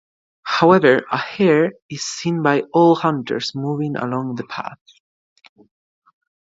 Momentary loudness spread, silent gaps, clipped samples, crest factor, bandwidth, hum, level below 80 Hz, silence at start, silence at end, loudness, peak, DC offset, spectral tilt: 14 LU; 1.82-1.89 s; under 0.1%; 18 dB; 7.8 kHz; none; -66 dBFS; 0.45 s; 1.75 s; -18 LUFS; 0 dBFS; under 0.1%; -5.5 dB/octave